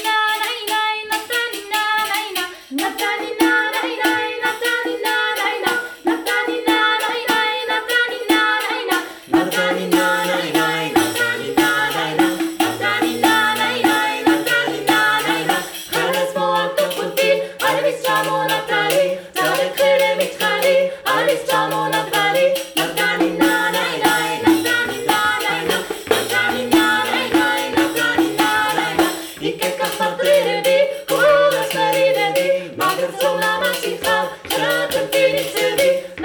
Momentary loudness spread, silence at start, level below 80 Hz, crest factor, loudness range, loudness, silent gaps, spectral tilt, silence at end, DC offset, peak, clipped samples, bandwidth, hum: 5 LU; 0 s; -56 dBFS; 16 dB; 2 LU; -17 LUFS; none; -3 dB/octave; 0 s; under 0.1%; -2 dBFS; under 0.1%; over 20 kHz; none